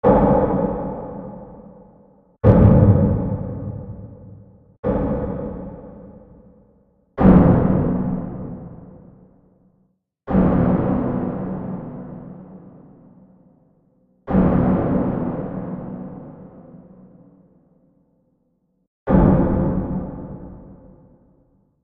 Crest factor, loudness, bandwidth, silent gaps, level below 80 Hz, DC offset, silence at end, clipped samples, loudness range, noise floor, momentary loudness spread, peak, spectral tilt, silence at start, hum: 20 dB; -19 LUFS; 3.6 kHz; 4.79-4.83 s, 18.87-19.06 s; -32 dBFS; under 0.1%; 1.1 s; under 0.1%; 11 LU; -66 dBFS; 25 LU; 0 dBFS; -13 dB/octave; 0.05 s; none